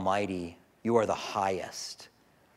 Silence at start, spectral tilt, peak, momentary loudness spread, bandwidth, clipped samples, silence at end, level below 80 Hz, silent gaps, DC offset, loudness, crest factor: 0 s; -4.5 dB/octave; -10 dBFS; 14 LU; 15.5 kHz; under 0.1%; 0.5 s; -68 dBFS; none; under 0.1%; -31 LUFS; 22 dB